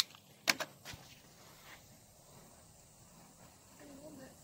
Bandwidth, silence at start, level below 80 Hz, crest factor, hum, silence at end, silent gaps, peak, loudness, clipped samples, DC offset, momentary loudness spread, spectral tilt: 16 kHz; 0 s; -72 dBFS; 36 dB; none; 0 s; none; -10 dBFS; -39 LUFS; under 0.1%; under 0.1%; 25 LU; -1 dB/octave